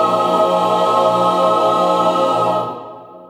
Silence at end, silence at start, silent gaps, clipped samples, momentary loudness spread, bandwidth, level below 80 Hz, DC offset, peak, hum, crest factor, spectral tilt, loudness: 0.05 s; 0 s; none; under 0.1%; 8 LU; 16 kHz; -64 dBFS; under 0.1%; -2 dBFS; 60 Hz at -35 dBFS; 12 dB; -5.5 dB/octave; -15 LUFS